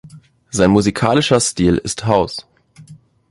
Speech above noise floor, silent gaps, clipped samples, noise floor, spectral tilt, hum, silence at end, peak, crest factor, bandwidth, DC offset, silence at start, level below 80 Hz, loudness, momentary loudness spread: 28 dB; none; under 0.1%; -43 dBFS; -5 dB/octave; none; 0.35 s; -2 dBFS; 16 dB; 11.5 kHz; under 0.1%; 0.05 s; -40 dBFS; -16 LUFS; 10 LU